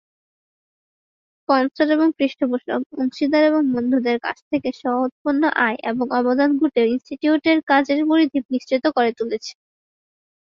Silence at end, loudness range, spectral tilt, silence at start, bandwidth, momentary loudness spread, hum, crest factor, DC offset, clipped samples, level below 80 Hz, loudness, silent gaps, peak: 1 s; 2 LU; -5 dB/octave; 1.5 s; 7.2 kHz; 7 LU; none; 18 dB; under 0.1%; under 0.1%; -66 dBFS; -20 LUFS; 2.86-2.90 s, 4.42-4.51 s, 5.12-5.25 s, 7.63-7.67 s, 8.45-8.49 s; -2 dBFS